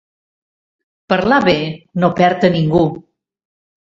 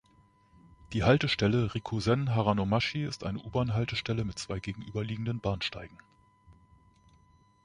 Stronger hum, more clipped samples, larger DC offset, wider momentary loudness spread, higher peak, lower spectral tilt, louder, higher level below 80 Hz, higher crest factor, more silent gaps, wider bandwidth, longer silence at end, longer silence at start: neither; neither; neither; second, 7 LU vs 11 LU; first, 0 dBFS vs -10 dBFS; first, -7.5 dB/octave vs -6 dB/octave; first, -15 LUFS vs -30 LUFS; first, -46 dBFS vs -52 dBFS; second, 16 dB vs 22 dB; neither; second, 7.4 kHz vs 10.5 kHz; second, 0.85 s vs 1.15 s; first, 1.1 s vs 0.9 s